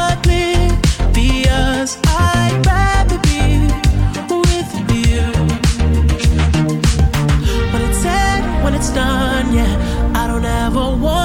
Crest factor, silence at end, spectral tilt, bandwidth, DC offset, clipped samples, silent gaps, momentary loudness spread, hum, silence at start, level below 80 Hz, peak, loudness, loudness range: 10 dB; 0 s; -5.5 dB/octave; 16.5 kHz; under 0.1%; under 0.1%; none; 3 LU; none; 0 s; -18 dBFS; -2 dBFS; -15 LUFS; 2 LU